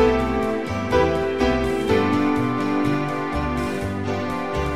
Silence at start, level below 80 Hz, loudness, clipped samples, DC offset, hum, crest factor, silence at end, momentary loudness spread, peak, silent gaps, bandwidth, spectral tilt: 0 s; -36 dBFS; -22 LUFS; under 0.1%; 0.9%; none; 16 dB; 0 s; 6 LU; -6 dBFS; none; 15.5 kHz; -6.5 dB/octave